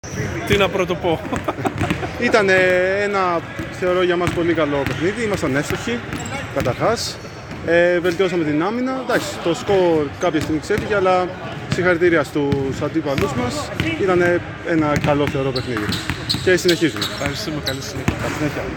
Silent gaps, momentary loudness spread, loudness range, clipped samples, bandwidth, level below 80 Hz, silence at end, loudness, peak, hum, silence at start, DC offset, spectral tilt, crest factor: none; 8 LU; 2 LU; under 0.1%; 19.5 kHz; -40 dBFS; 0 s; -19 LUFS; -2 dBFS; none; 0.05 s; under 0.1%; -5 dB/octave; 18 dB